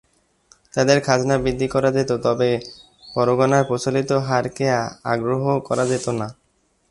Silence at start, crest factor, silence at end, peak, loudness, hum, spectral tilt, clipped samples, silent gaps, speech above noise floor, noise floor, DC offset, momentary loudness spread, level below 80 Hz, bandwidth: 0.75 s; 20 dB; 0.6 s; 0 dBFS; -20 LUFS; none; -5.5 dB/octave; under 0.1%; none; 45 dB; -65 dBFS; under 0.1%; 9 LU; -48 dBFS; 11.5 kHz